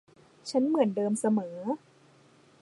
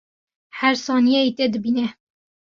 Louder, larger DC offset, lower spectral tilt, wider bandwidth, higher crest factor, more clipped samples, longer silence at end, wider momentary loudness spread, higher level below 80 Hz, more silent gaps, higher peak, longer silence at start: second, -29 LUFS vs -20 LUFS; neither; first, -6 dB/octave vs -4 dB/octave; first, 11.5 kHz vs 7.2 kHz; about the same, 20 dB vs 18 dB; neither; first, 0.85 s vs 0.65 s; about the same, 10 LU vs 8 LU; second, -82 dBFS vs -66 dBFS; neither; second, -12 dBFS vs -4 dBFS; about the same, 0.45 s vs 0.55 s